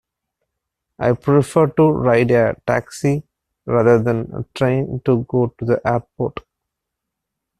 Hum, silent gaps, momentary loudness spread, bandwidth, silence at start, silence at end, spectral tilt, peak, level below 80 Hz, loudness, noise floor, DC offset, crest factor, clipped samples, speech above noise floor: none; none; 11 LU; 13 kHz; 1 s; 1.2 s; -8 dB/octave; -2 dBFS; -48 dBFS; -18 LUFS; -80 dBFS; under 0.1%; 18 dB; under 0.1%; 64 dB